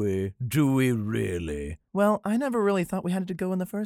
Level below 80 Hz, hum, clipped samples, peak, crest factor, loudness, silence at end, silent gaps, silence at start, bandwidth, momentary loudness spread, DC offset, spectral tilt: -50 dBFS; none; under 0.1%; -10 dBFS; 16 dB; -27 LUFS; 0 s; none; 0 s; 17 kHz; 8 LU; under 0.1%; -7 dB/octave